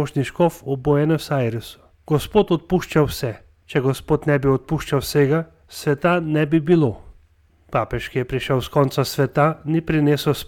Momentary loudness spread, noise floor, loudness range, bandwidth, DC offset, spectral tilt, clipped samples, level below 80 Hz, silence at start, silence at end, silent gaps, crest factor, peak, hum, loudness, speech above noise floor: 7 LU; -56 dBFS; 2 LU; 17.5 kHz; under 0.1%; -6.5 dB/octave; under 0.1%; -42 dBFS; 0 s; 0.05 s; none; 16 dB; -4 dBFS; none; -20 LUFS; 36 dB